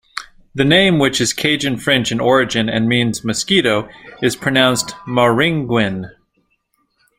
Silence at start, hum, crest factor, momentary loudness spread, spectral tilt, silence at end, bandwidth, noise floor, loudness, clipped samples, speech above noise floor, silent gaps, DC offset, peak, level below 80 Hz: 0.15 s; none; 16 dB; 8 LU; -4 dB/octave; 1.1 s; 16 kHz; -65 dBFS; -15 LUFS; under 0.1%; 49 dB; none; under 0.1%; 0 dBFS; -48 dBFS